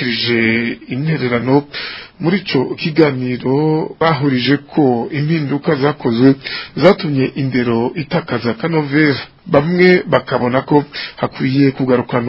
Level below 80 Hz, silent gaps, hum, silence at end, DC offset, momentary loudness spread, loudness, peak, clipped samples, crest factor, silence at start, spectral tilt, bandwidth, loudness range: -50 dBFS; none; none; 0 s; under 0.1%; 7 LU; -15 LUFS; 0 dBFS; under 0.1%; 14 dB; 0 s; -9 dB/octave; 5.8 kHz; 2 LU